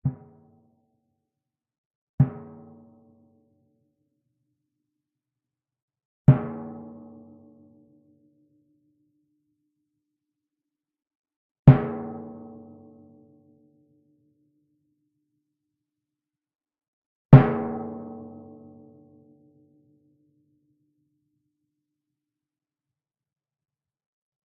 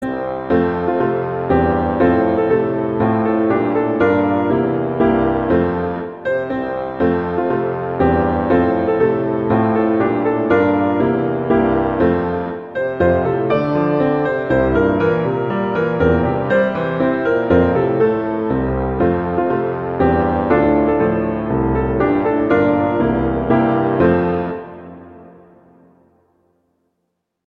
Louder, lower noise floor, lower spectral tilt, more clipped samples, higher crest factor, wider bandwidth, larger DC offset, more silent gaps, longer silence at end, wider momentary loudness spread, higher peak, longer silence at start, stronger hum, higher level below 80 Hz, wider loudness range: second, -20 LUFS vs -17 LUFS; first, -90 dBFS vs -73 dBFS; about the same, -10 dB/octave vs -10 dB/octave; neither; first, 28 dB vs 14 dB; second, 3.8 kHz vs 5.4 kHz; neither; first, 1.78-2.18 s, 5.82-5.88 s, 6.05-6.25 s, 11.15-11.24 s, 11.36-11.63 s, 16.88-17.29 s vs none; first, 6.3 s vs 2.2 s; first, 29 LU vs 5 LU; about the same, 0 dBFS vs -2 dBFS; about the same, 0.05 s vs 0 s; neither; second, -52 dBFS vs -36 dBFS; first, 11 LU vs 2 LU